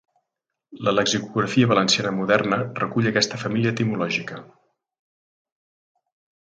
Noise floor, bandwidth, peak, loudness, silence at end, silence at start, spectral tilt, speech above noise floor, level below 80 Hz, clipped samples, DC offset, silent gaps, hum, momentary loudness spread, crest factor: -83 dBFS; 9.6 kHz; -2 dBFS; -21 LUFS; 2 s; 0.7 s; -4.5 dB/octave; 61 dB; -62 dBFS; under 0.1%; under 0.1%; none; none; 7 LU; 22 dB